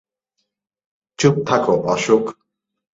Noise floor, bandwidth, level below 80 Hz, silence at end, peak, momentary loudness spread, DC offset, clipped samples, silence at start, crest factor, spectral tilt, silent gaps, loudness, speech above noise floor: -75 dBFS; 8 kHz; -58 dBFS; 0.65 s; -2 dBFS; 2 LU; under 0.1%; under 0.1%; 1.2 s; 20 dB; -5.5 dB/octave; none; -17 LUFS; 58 dB